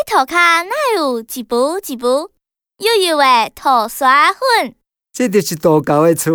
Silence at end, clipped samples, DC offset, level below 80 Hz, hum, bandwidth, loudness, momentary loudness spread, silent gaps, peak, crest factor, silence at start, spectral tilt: 0 s; under 0.1%; under 0.1%; -56 dBFS; none; over 20 kHz; -14 LUFS; 9 LU; none; 0 dBFS; 14 dB; 0 s; -3.5 dB/octave